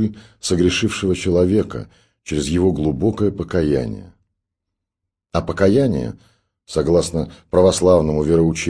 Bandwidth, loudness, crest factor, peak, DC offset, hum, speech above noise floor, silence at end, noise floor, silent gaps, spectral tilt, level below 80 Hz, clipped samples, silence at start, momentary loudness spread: 11 kHz; -18 LUFS; 18 dB; -2 dBFS; under 0.1%; none; 64 dB; 0 s; -82 dBFS; none; -6 dB/octave; -38 dBFS; under 0.1%; 0 s; 11 LU